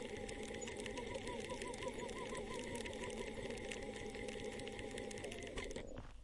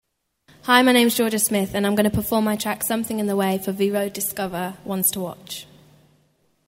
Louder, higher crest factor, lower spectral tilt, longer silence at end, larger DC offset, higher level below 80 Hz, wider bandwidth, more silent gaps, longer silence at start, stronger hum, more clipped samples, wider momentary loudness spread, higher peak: second, -47 LUFS vs -21 LUFS; about the same, 20 dB vs 22 dB; about the same, -4 dB/octave vs -3.5 dB/octave; second, 0 s vs 1.05 s; neither; second, -58 dBFS vs -50 dBFS; second, 11.5 kHz vs 16.5 kHz; neither; second, 0 s vs 0.65 s; neither; neither; second, 2 LU vs 14 LU; second, -26 dBFS vs 0 dBFS